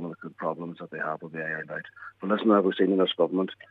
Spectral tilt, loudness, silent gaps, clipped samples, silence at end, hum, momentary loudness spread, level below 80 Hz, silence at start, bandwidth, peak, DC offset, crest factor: -8.5 dB/octave; -27 LUFS; none; under 0.1%; 0.15 s; none; 15 LU; -80 dBFS; 0 s; 4.6 kHz; -8 dBFS; under 0.1%; 20 dB